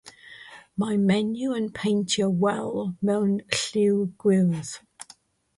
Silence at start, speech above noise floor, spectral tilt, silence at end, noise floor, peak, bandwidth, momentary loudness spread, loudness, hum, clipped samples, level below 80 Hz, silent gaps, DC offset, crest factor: 0.05 s; 31 dB; -5.5 dB/octave; 0.55 s; -55 dBFS; -4 dBFS; 11.5 kHz; 22 LU; -24 LUFS; none; under 0.1%; -62 dBFS; none; under 0.1%; 22 dB